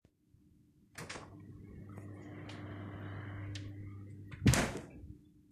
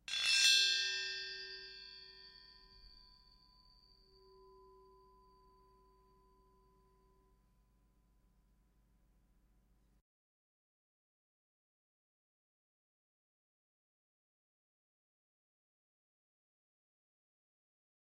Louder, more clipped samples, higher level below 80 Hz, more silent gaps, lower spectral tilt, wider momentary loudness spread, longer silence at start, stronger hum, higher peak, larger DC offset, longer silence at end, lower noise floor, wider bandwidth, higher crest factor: second, -39 LUFS vs -31 LUFS; neither; first, -54 dBFS vs -74 dBFS; neither; first, -5 dB/octave vs 3 dB/octave; second, 22 LU vs 28 LU; first, 0.95 s vs 0.1 s; second, none vs 50 Hz at -75 dBFS; first, -8 dBFS vs -18 dBFS; neither; second, 0.1 s vs 15.8 s; second, -68 dBFS vs -73 dBFS; first, 14.5 kHz vs 13 kHz; about the same, 32 dB vs 28 dB